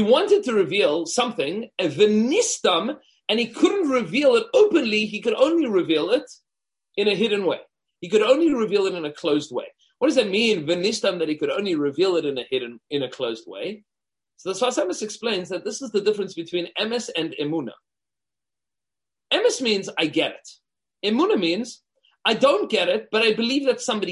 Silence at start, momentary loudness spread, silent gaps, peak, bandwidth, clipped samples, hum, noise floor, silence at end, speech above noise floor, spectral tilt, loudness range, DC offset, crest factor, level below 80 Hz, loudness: 0 s; 11 LU; none; -4 dBFS; 11.5 kHz; under 0.1%; none; under -90 dBFS; 0 s; over 68 dB; -3.5 dB/octave; 7 LU; under 0.1%; 18 dB; -70 dBFS; -22 LUFS